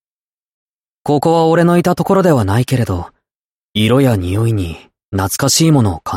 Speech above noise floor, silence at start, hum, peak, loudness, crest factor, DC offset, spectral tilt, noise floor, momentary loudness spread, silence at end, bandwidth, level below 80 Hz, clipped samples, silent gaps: over 77 dB; 1.05 s; none; -2 dBFS; -13 LUFS; 12 dB; under 0.1%; -5.5 dB/octave; under -90 dBFS; 13 LU; 0 s; 16.5 kHz; -40 dBFS; under 0.1%; 3.35-3.74 s, 5.05-5.12 s